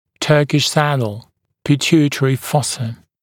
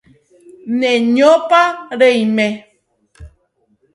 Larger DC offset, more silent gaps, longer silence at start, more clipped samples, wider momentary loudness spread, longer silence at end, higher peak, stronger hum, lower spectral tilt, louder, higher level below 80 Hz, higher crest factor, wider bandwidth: neither; neither; second, 0.2 s vs 0.65 s; neither; about the same, 12 LU vs 11 LU; second, 0.3 s vs 0.7 s; about the same, 0 dBFS vs 0 dBFS; neither; about the same, -5 dB/octave vs -5 dB/octave; second, -16 LUFS vs -13 LUFS; second, -56 dBFS vs -50 dBFS; about the same, 16 dB vs 16 dB; first, 17.5 kHz vs 11.5 kHz